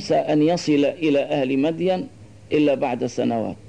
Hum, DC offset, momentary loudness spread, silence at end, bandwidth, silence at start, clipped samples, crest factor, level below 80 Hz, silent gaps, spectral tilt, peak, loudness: none; 0.2%; 5 LU; 0 s; 9.8 kHz; 0 s; under 0.1%; 12 dB; -58 dBFS; none; -6 dB/octave; -8 dBFS; -21 LUFS